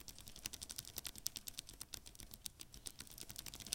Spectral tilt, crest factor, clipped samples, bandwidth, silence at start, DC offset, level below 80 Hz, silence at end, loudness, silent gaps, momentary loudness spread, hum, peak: -1 dB/octave; 38 dB; under 0.1%; 17 kHz; 0 s; under 0.1%; -64 dBFS; 0 s; -49 LUFS; none; 7 LU; none; -14 dBFS